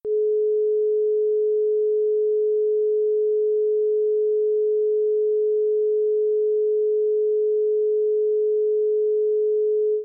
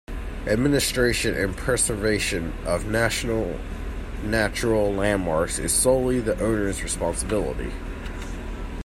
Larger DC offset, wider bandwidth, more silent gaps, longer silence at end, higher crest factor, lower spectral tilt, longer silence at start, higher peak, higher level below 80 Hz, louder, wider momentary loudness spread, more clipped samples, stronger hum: neither; second, 0.6 kHz vs 16 kHz; neither; about the same, 0 s vs 0 s; second, 4 dB vs 18 dB; first, -11.5 dB/octave vs -4 dB/octave; about the same, 0.05 s vs 0.1 s; second, -18 dBFS vs -6 dBFS; second, -82 dBFS vs -34 dBFS; about the same, -21 LUFS vs -23 LUFS; second, 0 LU vs 14 LU; neither; neither